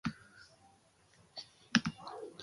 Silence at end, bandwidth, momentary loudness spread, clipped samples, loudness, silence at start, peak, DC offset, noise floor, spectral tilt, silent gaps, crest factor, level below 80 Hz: 0 s; 11.5 kHz; 25 LU; under 0.1%; -37 LUFS; 0.05 s; -8 dBFS; under 0.1%; -67 dBFS; -4 dB/octave; none; 34 dB; -68 dBFS